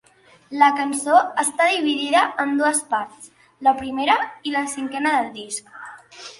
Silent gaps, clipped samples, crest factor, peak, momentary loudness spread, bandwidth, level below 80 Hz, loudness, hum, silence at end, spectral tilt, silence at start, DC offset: none; under 0.1%; 20 dB; -2 dBFS; 15 LU; 12 kHz; -64 dBFS; -20 LUFS; none; 0.1 s; -1.5 dB/octave; 0.5 s; under 0.1%